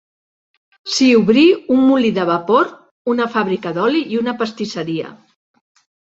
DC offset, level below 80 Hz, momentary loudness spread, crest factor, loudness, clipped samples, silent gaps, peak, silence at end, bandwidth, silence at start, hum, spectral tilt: under 0.1%; -60 dBFS; 12 LU; 16 dB; -16 LUFS; under 0.1%; 2.91-3.05 s; -2 dBFS; 0.95 s; 8 kHz; 0.85 s; none; -5 dB/octave